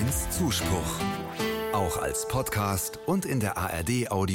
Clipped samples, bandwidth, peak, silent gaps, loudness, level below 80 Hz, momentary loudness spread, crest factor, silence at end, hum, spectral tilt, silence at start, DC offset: under 0.1%; 17 kHz; -14 dBFS; none; -28 LUFS; -44 dBFS; 3 LU; 14 dB; 0 s; none; -4.5 dB/octave; 0 s; under 0.1%